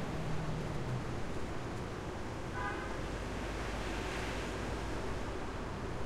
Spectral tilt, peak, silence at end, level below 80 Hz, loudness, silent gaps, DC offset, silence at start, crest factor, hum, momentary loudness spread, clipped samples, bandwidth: -5.5 dB/octave; -24 dBFS; 0 s; -46 dBFS; -40 LUFS; none; under 0.1%; 0 s; 14 dB; none; 3 LU; under 0.1%; 15 kHz